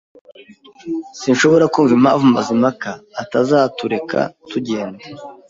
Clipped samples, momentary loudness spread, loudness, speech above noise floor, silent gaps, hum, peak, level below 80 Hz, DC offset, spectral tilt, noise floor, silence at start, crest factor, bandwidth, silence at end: under 0.1%; 16 LU; -16 LUFS; 28 dB; none; none; -2 dBFS; -58 dBFS; under 0.1%; -5.5 dB/octave; -43 dBFS; 0.85 s; 16 dB; 7.8 kHz; 0.15 s